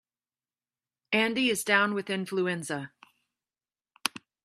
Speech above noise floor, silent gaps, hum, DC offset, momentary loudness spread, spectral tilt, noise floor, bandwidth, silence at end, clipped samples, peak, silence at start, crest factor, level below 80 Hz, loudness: over 62 dB; none; none; under 0.1%; 11 LU; -3.5 dB/octave; under -90 dBFS; 13.5 kHz; 0.25 s; under 0.1%; -6 dBFS; 1.1 s; 26 dB; -76 dBFS; -28 LUFS